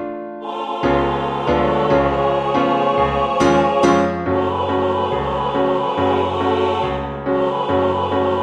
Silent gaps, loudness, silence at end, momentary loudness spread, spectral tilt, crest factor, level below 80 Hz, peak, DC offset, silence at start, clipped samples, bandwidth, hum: none; -18 LUFS; 0 s; 6 LU; -6.5 dB/octave; 16 dB; -38 dBFS; -2 dBFS; under 0.1%; 0 s; under 0.1%; 10 kHz; none